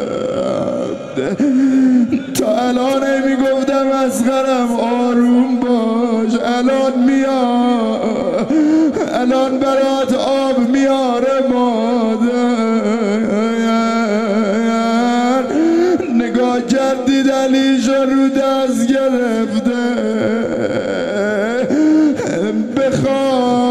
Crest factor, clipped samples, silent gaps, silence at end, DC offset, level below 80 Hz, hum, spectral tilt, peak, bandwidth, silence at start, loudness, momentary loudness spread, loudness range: 12 dB; under 0.1%; none; 0 s; 0.4%; -54 dBFS; none; -5.5 dB/octave; -2 dBFS; 13.5 kHz; 0 s; -15 LUFS; 4 LU; 2 LU